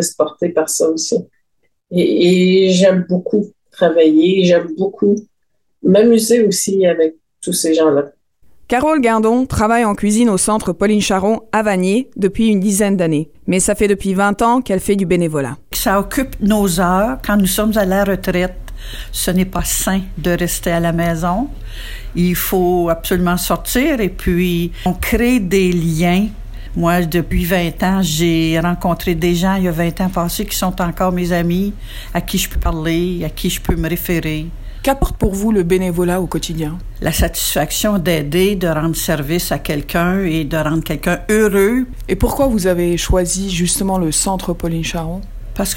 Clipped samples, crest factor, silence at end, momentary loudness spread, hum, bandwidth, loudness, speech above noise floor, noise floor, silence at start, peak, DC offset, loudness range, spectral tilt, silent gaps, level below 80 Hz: under 0.1%; 14 dB; 0 s; 8 LU; none; 16.5 kHz; -16 LUFS; 56 dB; -71 dBFS; 0 s; -2 dBFS; under 0.1%; 4 LU; -5 dB/octave; none; -28 dBFS